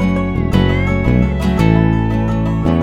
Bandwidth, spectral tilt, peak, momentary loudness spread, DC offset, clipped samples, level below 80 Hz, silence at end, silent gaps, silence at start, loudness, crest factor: 13.5 kHz; -8 dB/octave; 0 dBFS; 4 LU; under 0.1%; under 0.1%; -22 dBFS; 0 s; none; 0 s; -15 LUFS; 14 dB